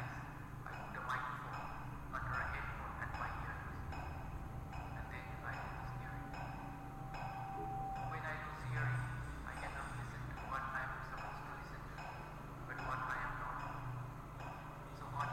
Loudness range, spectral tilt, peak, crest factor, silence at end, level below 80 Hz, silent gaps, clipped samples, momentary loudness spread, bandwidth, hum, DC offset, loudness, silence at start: 3 LU; -6 dB/octave; -28 dBFS; 16 dB; 0 s; -54 dBFS; none; under 0.1%; 8 LU; 16 kHz; none; under 0.1%; -45 LUFS; 0 s